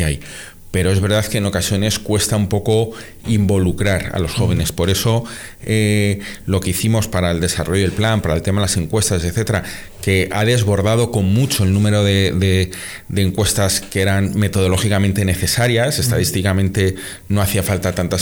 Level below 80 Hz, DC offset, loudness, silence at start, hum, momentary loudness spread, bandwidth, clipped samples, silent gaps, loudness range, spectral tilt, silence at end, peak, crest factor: -38 dBFS; under 0.1%; -17 LUFS; 0 s; none; 6 LU; over 20 kHz; under 0.1%; none; 2 LU; -5 dB/octave; 0 s; -6 dBFS; 10 dB